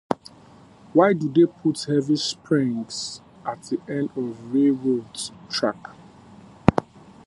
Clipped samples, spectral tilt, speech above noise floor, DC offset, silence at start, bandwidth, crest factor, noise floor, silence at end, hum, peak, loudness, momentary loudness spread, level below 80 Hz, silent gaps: under 0.1%; -5.5 dB/octave; 27 dB; under 0.1%; 0.1 s; 11.5 kHz; 24 dB; -49 dBFS; 0.45 s; none; 0 dBFS; -24 LUFS; 14 LU; -50 dBFS; none